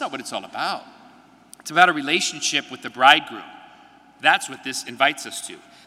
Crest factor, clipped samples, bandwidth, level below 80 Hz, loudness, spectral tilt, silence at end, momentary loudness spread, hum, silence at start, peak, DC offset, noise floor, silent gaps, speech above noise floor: 22 dB; under 0.1%; 16 kHz; -72 dBFS; -20 LUFS; -1.5 dB/octave; 0.3 s; 19 LU; none; 0 s; 0 dBFS; under 0.1%; -50 dBFS; none; 29 dB